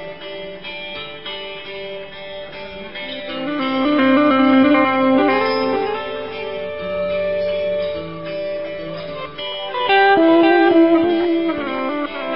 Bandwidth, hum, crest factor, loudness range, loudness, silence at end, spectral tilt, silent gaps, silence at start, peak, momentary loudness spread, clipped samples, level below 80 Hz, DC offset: 5.6 kHz; none; 14 dB; 9 LU; -17 LUFS; 0 s; -9.5 dB/octave; none; 0 s; -4 dBFS; 18 LU; under 0.1%; -52 dBFS; 0.8%